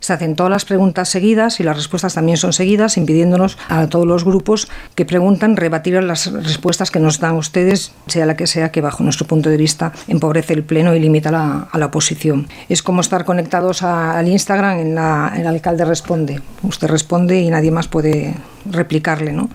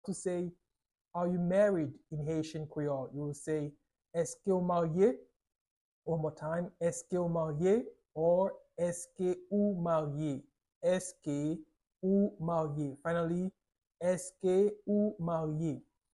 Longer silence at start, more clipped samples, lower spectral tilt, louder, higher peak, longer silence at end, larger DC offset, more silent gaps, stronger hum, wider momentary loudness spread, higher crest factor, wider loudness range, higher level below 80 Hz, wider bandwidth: about the same, 0 s vs 0.05 s; neither; second, -5 dB/octave vs -7 dB/octave; first, -15 LUFS vs -34 LUFS; first, -2 dBFS vs -18 dBFS; second, 0 s vs 0.35 s; neither; second, none vs 1.01-1.05 s, 5.36-5.40 s, 5.61-5.65 s, 5.71-6.02 s, 10.76-10.81 s; neither; second, 5 LU vs 10 LU; about the same, 14 dB vs 16 dB; about the same, 2 LU vs 2 LU; first, -44 dBFS vs -68 dBFS; first, 15 kHz vs 12 kHz